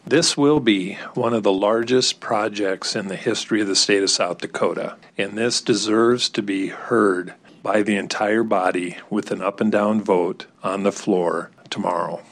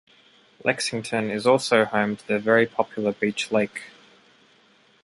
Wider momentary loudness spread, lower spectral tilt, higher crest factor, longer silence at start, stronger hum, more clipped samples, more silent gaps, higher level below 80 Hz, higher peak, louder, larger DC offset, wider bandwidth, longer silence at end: first, 10 LU vs 7 LU; about the same, -3.5 dB/octave vs -4.5 dB/octave; second, 16 dB vs 22 dB; second, 0.05 s vs 0.65 s; neither; neither; neither; about the same, -64 dBFS vs -66 dBFS; about the same, -6 dBFS vs -4 dBFS; first, -20 LUFS vs -23 LUFS; neither; about the same, 12 kHz vs 11.5 kHz; second, 0.1 s vs 1.15 s